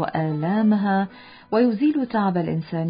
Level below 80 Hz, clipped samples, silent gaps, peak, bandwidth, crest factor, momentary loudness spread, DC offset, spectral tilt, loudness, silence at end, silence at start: -60 dBFS; under 0.1%; none; -8 dBFS; 5.2 kHz; 12 dB; 6 LU; under 0.1%; -12.5 dB/octave; -22 LUFS; 0 s; 0 s